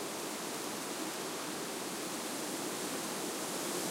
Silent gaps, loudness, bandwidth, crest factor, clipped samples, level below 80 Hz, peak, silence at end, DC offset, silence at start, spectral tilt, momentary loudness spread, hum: none; -38 LUFS; 16 kHz; 14 dB; under 0.1%; -80 dBFS; -24 dBFS; 0 s; under 0.1%; 0 s; -2 dB/octave; 2 LU; none